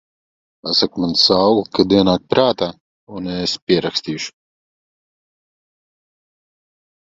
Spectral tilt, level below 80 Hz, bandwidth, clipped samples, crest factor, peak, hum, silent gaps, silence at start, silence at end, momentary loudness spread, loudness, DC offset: -5 dB/octave; -50 dBFS; 8 kHz; under 0.1%; 20 dB; 0 dBFS; none; 2.80-3.07 s, 3.62-3.67 s; 0.65 s; 2.85 s; 14 LU; -16 LUFS; under 0.1%